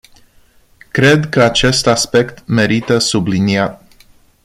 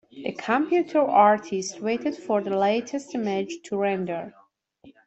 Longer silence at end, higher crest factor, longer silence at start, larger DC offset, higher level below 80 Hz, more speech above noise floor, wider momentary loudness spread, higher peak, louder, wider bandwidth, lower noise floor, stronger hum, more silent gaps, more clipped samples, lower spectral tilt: first, 0.7 s vs 0.15 s; about the same, 14 dB vs 18 dB; first, 0.95 s vs 0.15 s; neither; first, -40 dBFS vs -72 dBFS; first, 36 dB vs 31 dB; second, 6 LU vs 13 LU; first, 0 dBFS vs -6 dBFS; first, -13 LUFS vs -24 LUFS; first, 15.5 kHz vs 8.2 kHz; second, -49 dBFS vs -55 dBFS; neither; neither; neither; about the same, -4.5 dB/octave vs -5 dB/octave